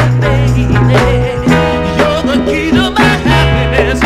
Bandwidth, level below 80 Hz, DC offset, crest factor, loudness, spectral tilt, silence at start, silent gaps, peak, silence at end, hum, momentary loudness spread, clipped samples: 14 kHz; -20 dBFS; under 0.1%; 10 dB; -10 LUFS; -6.5 dB/octave; 0 s; none; 0 dBFS; 0 s; none; 3 LU; 0.3%